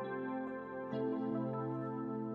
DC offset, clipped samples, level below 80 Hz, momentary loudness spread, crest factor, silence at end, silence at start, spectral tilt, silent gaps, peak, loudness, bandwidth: under 0.1%; under 0.1%; -78 dBFS; 4 LU; 12 dB; 0 s; 0 s; -10 dB/octave; none; -28 dBFS; -40 LUFS; 5.2 kHz